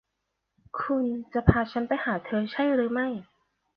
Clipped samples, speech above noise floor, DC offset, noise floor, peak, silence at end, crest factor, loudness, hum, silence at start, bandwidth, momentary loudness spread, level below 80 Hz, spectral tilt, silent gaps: under 0.1%; 55 dB; under 0.1%; -81 dBFS; -2 dBFS; 0.55 s; 26 dB; -27 LUFS; none; 0.75 s; 5.6 kHz; 9 LU; -44 dBFS; -10 dB/octave; none